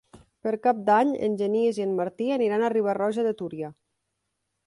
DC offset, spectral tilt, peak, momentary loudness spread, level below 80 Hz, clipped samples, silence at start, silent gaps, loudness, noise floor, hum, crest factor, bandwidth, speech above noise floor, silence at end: under 0.1%; -6.5 dB/octave; -8 dBFS; 12 LU; -70 dBFS; under 0.1%; 0.15 s; none; -25 LUFS; -79 dBFS; none; 18 dB; 11.5 kHz; 55 dB; 0.95 s